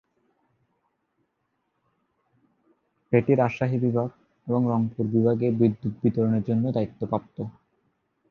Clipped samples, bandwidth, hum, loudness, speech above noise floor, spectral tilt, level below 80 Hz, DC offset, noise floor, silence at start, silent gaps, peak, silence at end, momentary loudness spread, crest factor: under 0.1%; 6.4 kHz; none; -25 LUFS; 52 dB; -10.5 dB/octave; -62 dBFS; under 0.1%; -76 dBFS; 3.1 s; none; -6 dBFS; 0.8 s; 9 LU; 20 dB